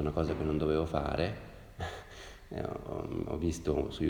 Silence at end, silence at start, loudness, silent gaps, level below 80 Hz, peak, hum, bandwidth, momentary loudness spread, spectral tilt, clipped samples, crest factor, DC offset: 0 s; 0 s; -35 LUFS; none; -46 dBFS; -16 dBFS; none; 19.5 kHz; 15 LU; -7 dB/octave; under 0.1%; 20 dB; under 0.1%